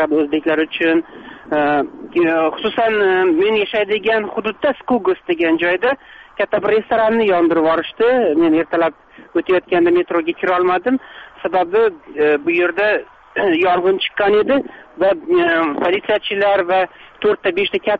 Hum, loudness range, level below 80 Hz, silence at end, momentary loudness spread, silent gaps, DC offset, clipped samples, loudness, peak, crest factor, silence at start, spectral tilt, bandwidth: none; 2 LU; -54 dBFS; 0 s; 6 LU; none; under 0.1%; under 0.1%; -16 LUFS; -6 dBFS; 10 dB; 0 s; -7 dB/octave; 4.9 kHz